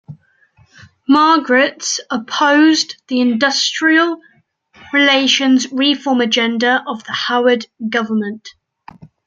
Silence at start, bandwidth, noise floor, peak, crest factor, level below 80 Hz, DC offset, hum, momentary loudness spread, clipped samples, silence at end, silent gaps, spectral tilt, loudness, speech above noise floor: 0.1 s; 9 kHz; -53 dBFS; -2 dBFS; 14 dB; -66 dBFS; under 0.1%; none; 9 LU; under 0.1%; 0.2 s; none; -2.5 dB/octave; -14 LUFS; 39 dB